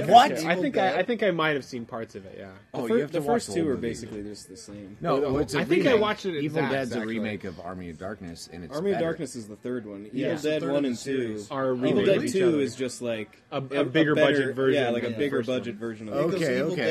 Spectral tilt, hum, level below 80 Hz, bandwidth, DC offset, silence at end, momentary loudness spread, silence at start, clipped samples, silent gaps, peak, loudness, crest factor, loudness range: -5.5 dB/octave; none; -58 dBFS; 14 kHz; under 0.1%; 0 s; 15 LU; 0 s; under 0.1%; none; -2 dBFS; -26 LUFS; 22 dB; 6 LU